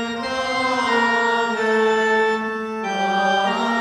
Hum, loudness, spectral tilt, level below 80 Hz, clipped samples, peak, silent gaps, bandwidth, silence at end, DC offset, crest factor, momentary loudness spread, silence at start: none; -19 LUFS; -3.5 dB/octave; -58 dBFS; under 0.1%; -8 dBFS; none; 12 kHz; 0 s; under 0.1%; 12 dB; 7 LU; 0 s